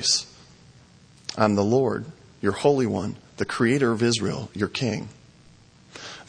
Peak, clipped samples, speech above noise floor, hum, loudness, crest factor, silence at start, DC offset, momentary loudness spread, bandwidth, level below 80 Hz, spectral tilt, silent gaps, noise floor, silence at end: -4 dBFS; under 0.1%; 30 dB; none; -24 LUFS; 22 dB; 0 s; under 0.1%; 18 LU; 10.5 kHz; -60 dBFS; -4.5 dB/octave; none; -53 dBFS; 0.05 s